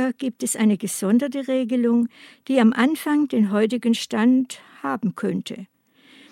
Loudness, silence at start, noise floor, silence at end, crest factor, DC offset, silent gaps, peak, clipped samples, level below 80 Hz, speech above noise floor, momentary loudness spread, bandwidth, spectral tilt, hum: -21 LUFS; 0 s; -53 dBFS; 0.65 s; 18 dB; under 0.1%; none; -4 dBFS; under 0.1%; -76 dBFS; 32 dB; 10 LU; 15 kHz; -5 dB/octave; none